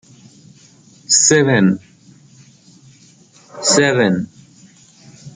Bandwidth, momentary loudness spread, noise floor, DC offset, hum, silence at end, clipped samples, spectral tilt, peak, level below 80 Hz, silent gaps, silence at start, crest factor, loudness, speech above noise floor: 9.8 kHz; 12 LU; -48 dBFS; under 0.1%; none; 0.05 s; under 0.1%; -3.5 dB/octave; 0 dBFS; -60 dBFS; none; 1.1 s; 18 dB; -14 LUFS; 34 dB